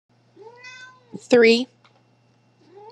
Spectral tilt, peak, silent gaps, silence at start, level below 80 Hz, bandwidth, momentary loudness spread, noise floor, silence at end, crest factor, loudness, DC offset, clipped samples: -4 dB/octave; -2 dBFS; none; 0.65 s; -84 dBFS; 9.6 kHz; 27 LU; -60 dBFS; 1.25 s; 20 dB; -17 LUFS; under 0.1%; under 0.1%